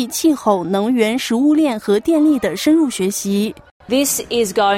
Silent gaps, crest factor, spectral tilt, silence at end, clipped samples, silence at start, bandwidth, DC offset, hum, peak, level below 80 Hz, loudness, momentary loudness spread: 3.71-3.80 s; 14 dB; -4 dB/octave; 0 s; under 0.1%; 0 s; 16.5 kHz; under 0.1%; none; -2 dBFS; -54 dBFS; -16 LUFS; 5 LU